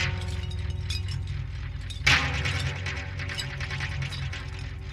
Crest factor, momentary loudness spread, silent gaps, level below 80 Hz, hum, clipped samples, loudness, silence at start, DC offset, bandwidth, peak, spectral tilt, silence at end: 22 dB; 14 LU; none; -38 dBFS; none; under 0.1%; -29 LUFS; 0 s; under 0.1%; 13 kHz; -6 dBFS; -3.5 dB/octave; 0 s